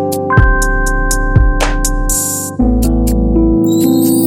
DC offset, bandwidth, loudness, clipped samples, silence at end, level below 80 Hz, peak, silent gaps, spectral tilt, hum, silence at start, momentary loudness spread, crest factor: under 0.1%; 17 kHz; -12 LUFS; under 0.1%; 0 s; -14 dBFS; 0 dBFS; none; -5 dB/octave; none; 0 s; 4 LU; 10 dB